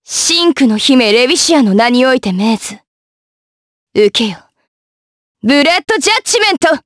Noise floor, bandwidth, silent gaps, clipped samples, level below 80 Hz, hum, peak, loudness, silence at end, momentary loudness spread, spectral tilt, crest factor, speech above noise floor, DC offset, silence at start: under -90 dBFS; 11 kHz; 2.87-3.87 s, 4.68-5.35 s; under 0.1%; -54 dBFS; none; 0 dBFS; -10 LUFS; 0.05 s; 7 LU; -3 dB/octave; 12 dB; over 80 dB; under 0.1%; 0.1 s